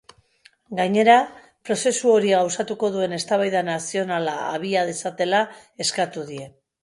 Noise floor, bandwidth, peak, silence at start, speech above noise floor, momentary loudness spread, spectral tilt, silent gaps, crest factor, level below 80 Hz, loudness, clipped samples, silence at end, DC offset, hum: -57 dBFS; 11.5 kHz; -4 dBFS; 0.7 s; 36 dB; 13 LU; -3.5 dB/octave; none; 18 dB; -68 dBFS; -22 LUFS; under 0.1%; 0.35 s; under 0.1%; none